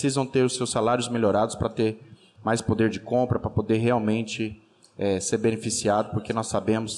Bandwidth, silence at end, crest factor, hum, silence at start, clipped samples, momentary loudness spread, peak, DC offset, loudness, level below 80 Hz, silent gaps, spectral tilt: 12.5 kHz; 0 s; 12 dB; none; 0 s; under 0.1%; 5 LU; -12 dBFS; under 0.1%; -25 LUFS; -52 dBFS; none; -5 dB/octave